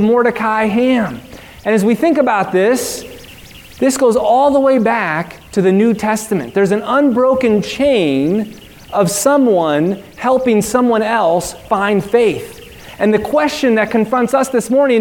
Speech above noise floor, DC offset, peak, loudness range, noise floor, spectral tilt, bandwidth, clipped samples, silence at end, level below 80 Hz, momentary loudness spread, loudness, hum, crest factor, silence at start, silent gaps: 23 dB; under 0.1%; 0 dBFS; 1 LU; -37 dBFS; -5 dB/octave; 18 kHz; under 0.1%; 0 s; -46 dBFS; 9 LU; -14 LUFS; none; 14 dB; 0 s; none